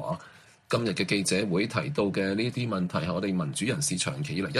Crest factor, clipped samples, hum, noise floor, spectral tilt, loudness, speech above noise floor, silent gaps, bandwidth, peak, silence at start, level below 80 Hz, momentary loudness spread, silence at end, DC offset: 18 dB; under 0.1%; none; -53 dBFS; -4.5 dB/octave; -28 LUFS; 25 dB; none; 14 kHz; -10 dBFS; 0 s; -60 dBFS; 4 LU; 0 s; under 0.1%